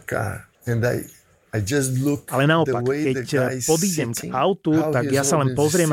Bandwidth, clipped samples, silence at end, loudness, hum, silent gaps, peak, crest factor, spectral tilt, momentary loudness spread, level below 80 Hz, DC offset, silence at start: 17 kHz; under 0.1%; 0 s; -21 LUFS; none; none; -6 dBFS; 16 dB; -5 dB/octave; 8 LU; -52 dBFS; under 0.1%; 0.1 s